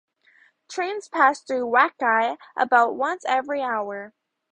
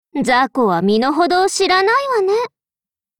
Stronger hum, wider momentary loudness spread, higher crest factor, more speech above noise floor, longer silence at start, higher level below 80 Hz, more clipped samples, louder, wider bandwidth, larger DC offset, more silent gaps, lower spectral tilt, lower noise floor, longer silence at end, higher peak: neither; first, 12 LU vs 4 LU; first, 20 dB vs 12 dB; second, 36 dB vs over 75 dB; first, 0.7 s vs 0.15 s; second, -74 dBFS vs -56 dBFS; neither; second, -22 LUFS vs -15 LUFS; second, 10 kHz vs 17.5 kHz; neither; neither; about the same, -3 dB/octave vs -4 dB/octave; second, -59 dBFS vs under -90 dBFS; second, 0.45 s vs 0.75 s; about the same, -4 dBFS vs -4 dBFS